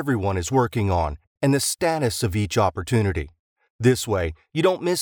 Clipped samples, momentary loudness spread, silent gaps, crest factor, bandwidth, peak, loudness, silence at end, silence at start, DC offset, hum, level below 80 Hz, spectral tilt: under 0.1%; 5 LU; 1.27-1.36 s, 3.39-3.56 s, 3.70-3.79 s; 18 dB; over 20 kHz; -4 dBFS; -23 LUFS; 0 s; 0 s; under 0.1%; none; -42 dBFS; -5.5 dB/octave